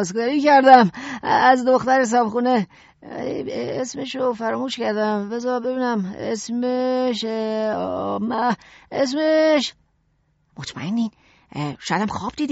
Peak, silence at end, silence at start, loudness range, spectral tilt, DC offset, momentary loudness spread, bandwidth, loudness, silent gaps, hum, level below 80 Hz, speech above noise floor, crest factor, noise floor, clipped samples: 0 dBFS; 0 s; 0 s; 7 LU; -3.5 dB/octave; under 0.1%; 13 LU; 8 kHz; -20 LUFS; none; none; -60 dBFS; 45 dB; 20 dB; -65 dBFS; under 0.1%